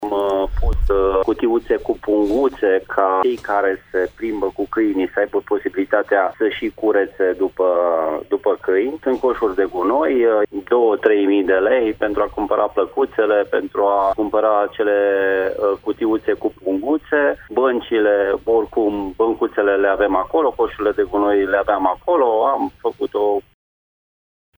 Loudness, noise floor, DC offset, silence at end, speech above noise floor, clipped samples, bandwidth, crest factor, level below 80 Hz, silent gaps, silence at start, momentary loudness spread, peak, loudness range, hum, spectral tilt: -18 LUFS; under -90 dBFS; under 0.1%; 1.15 s; over 72 dB; under 0.1%; over 20 kHz; 16 dB; -34 dBFS; none; 0 s; 5 LU; 0 dBFS; 2 LU; none; -7.5 dB/octave